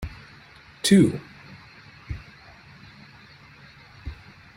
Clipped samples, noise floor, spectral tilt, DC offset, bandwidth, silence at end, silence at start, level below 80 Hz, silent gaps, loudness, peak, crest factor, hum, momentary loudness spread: under 0.1%; -50 dBFS; -5.5 dB/octave; under 0.1%; 16 kHz; 0.4 s; 0 s; -48 dBFS; none; -20 LUFS; -6 dBFS; 22 dB; none; 30 LU